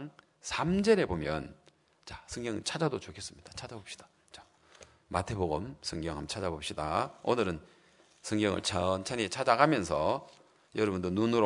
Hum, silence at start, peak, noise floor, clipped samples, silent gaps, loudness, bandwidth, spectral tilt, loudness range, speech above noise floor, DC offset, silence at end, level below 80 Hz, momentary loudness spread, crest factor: none; 0 s; -6 dBFS; -65 dBFS; under 0.1%; none; -32 LUFS; 11 kHz; -5 dB/octave; 8 LU; 34 dB; under 0.1%; 0 s; -58 dBFS; 18 LU; 26 dB